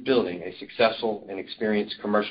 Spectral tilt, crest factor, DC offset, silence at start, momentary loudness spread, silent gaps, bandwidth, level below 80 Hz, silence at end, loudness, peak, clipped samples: -9.5 dB/octave; 18 dB; under 0.1%; 0 s; 12 LU; none; 5.4 kHz; -62 dBFS; 0 s; -27 LUFS; -8 dBFS; under 0.1%